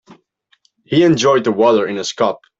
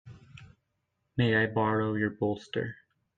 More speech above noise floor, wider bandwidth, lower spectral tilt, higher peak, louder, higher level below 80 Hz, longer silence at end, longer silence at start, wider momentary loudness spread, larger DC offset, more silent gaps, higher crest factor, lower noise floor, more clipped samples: second, 45 dB vs 51 dB; about the same, 8 kHz vs 7.6 kHz; second, -5 dB/octave vs -8 dB/octave; first, -2 dBFS vs -14 dBFS; first, -14 LUFS vs -29 LUFS; first, -56 dBFS vs -64 dBFS; second, 0.25 s vs 0.45 s; about the same, 0.1 s vs 0.05 s; second, 7 LU vs 10 LU; neither; neither; about the same, 14 dB vs 18 dB; second, -59 dBFS vs -80 dBFS; neither